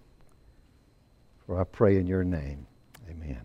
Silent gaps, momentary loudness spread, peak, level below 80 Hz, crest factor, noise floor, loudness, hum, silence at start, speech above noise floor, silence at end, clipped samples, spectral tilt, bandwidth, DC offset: none; 20 LU; -10 dBFS; -46 dBFS; 22 dB; -61 dBFS; -28 LUFS; none; 1.5 s; 35 dB; 0 s; under 0.1%; -10 dB/octave; 6.4 kHz; under 0.1%